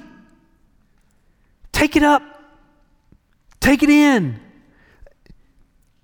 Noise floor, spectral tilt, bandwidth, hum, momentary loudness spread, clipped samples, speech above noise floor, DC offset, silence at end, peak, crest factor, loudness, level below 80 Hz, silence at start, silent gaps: -58 dBFS; -5 dB/octave; 19 kHz; none; 13 LU; under 0.1%; 43 dB; under 0.1%; 1.65 s; -4 dBFS; 18 dB; -16 LUFS; -40 dBFS; 1.75 s; none